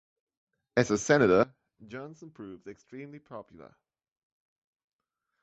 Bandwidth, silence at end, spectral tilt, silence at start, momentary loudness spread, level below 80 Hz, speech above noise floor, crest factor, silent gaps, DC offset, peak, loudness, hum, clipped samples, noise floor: 8.2 kHz; 2 s; -5.5 dB/octave; 0.75 s; 23 LU; -64 dBFS; 55 dB; 24 dB; none; under 0.1%; -8 dBFS; -26 LUFS; none; under 0.1%; -84 dBFS